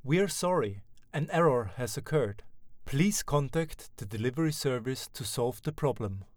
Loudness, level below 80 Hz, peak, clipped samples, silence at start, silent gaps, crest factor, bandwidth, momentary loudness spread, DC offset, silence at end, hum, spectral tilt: -31 LUFS; -52 dBFS; -14 dBFS; under 0.1%; 0.05 s; none; 18 dB; over 20 kHz; 10 LU; under 0.1%; 0.15 s; none; -5.5 dB/octave